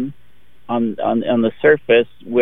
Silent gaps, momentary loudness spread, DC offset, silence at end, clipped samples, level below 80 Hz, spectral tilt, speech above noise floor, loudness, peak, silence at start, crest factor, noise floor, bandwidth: none; 8 LU; 1%; 0 s; under 0.1%; -54 dBFS; -8.5 dB/octave; 39 dB; -17 LUFS; -2 dBFS; 0 s; 16 dB; -55 dBFS; 3.9 kHz